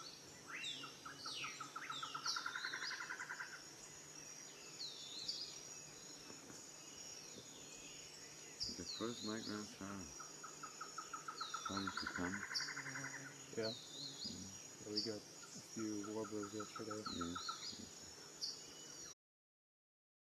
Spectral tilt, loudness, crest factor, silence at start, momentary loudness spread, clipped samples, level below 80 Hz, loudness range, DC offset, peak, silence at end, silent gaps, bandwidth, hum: -2 dB/octave; -47 LUFS; 22 dB; 0 s; 10 LU; under 0.1%; -78 dBFS; 5 LU; under 0.1%; -28 dBFS; 1.25 s; none; 13.5 kHz; none